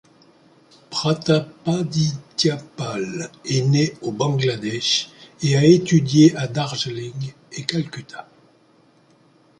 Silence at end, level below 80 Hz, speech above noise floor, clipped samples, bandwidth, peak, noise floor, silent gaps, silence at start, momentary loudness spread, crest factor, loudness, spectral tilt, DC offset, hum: 1.35 s; -58 dBFS; 36 dB; under 0.1%; 11 kHz; -2 dBFS; -56 dBFS; none; 0.9 s; 16 LU; 20 dB; -20 LUFS; -5.5 dB/octave; under 0.1%; none